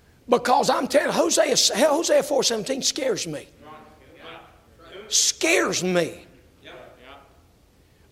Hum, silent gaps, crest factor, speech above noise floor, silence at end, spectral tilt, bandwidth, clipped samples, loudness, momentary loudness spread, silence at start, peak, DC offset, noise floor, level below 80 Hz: none; none; 20 dB; 36 dB; 0.95 s; -2 dB/octave; 16.5 kHz; under 0.1%; -21 LUFS; 14 LU; 0.3 s; -2 dBFS; under 0.1%; -57 dBFS; -60 dBFS